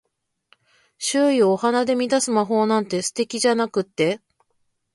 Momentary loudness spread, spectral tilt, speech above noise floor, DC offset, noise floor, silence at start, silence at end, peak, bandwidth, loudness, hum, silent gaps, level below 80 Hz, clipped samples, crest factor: 7 LU; -4 dB/octave; 50 dB; under 0.1%; -70 dBFS; 1 s; 0.8 s; -6 dBFS; 11.5 kHz; -21 LUFS; none; none; -70 dBFS; under 0.1%; 14 dB